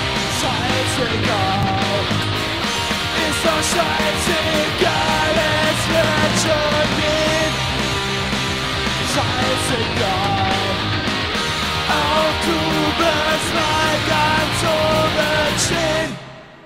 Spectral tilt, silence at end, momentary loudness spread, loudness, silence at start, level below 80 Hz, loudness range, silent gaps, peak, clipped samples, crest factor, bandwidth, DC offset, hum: -3.5 dB/octave; 0.05 s; 3 LU; -17 LUFS; 0 s; -36 dBFS; 2 LU; none; -4 dBFS; under 0.1%; 16 dB; 16 kHz; under 0.1%; none